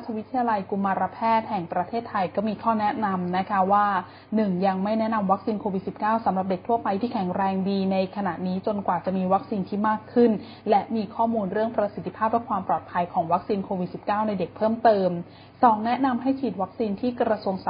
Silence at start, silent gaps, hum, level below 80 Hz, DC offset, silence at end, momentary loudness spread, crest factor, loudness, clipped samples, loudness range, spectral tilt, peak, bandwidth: 0 s; none; none; -60 dBFS; under 0.1%; 0 s; 7 LU; 20 dB; -25 LUFS; under 0.1%; 2 LU; -11.5 dB/octave; -4 dBFS; 5.2 kHz